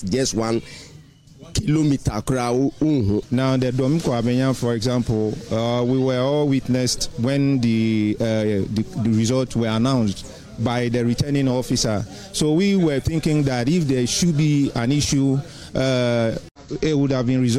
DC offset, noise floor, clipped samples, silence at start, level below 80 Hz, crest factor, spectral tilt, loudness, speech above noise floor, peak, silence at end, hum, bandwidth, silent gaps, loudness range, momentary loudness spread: under 0.1%; -45 dBFS; under 0.1%; 0 s; -42 dBFS; 10 dB; -6 dB/octave; -21 LUFS; 26 dB; -10 dBFS; 0 s; none; 15 kHz; 16.51-16.55 s; 2 LU; 6 LU